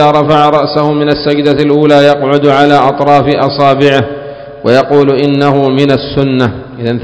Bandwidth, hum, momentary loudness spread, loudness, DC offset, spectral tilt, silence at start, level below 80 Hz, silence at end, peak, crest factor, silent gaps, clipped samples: 8 kHz; none; 7 LU; -8 LUFS; 0.5%; -7 dB/octave; 0 s; -40 dBFS; 0 s; 0 dBFS; 8 dB; none; 3%